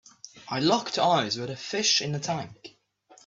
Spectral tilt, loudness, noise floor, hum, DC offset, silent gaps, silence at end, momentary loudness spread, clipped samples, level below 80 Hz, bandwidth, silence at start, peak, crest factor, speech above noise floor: -3 dB/octave; -26 LUFS; -58 dBFS; none; under 0.1%; none; 0.55 s; 16 LU; under 0.1%; -68 dBFS; 8 kHz; 0.25 s; -8 dBFS; 20 dB; 32 dB